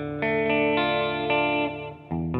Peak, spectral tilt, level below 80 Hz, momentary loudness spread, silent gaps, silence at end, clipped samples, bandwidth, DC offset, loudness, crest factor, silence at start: -10 dBFS; -8.5 dB/octave; -50 dBFS; 9 LU; none; 0 s; under 0.1%; 5.4 kHz; under 0.1%; -24 LUFS; 16 dB; 0 s